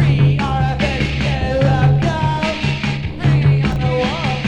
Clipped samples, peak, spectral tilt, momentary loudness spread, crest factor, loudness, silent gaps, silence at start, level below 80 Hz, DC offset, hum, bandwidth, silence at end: under 0.1%; -2 dBFS; -7 dB/octave; 5 LU; 12 dB; -16 LUFS; none; 0 s; -28 dBFS; under 0.1%; none; 8.4 kHz; 0 s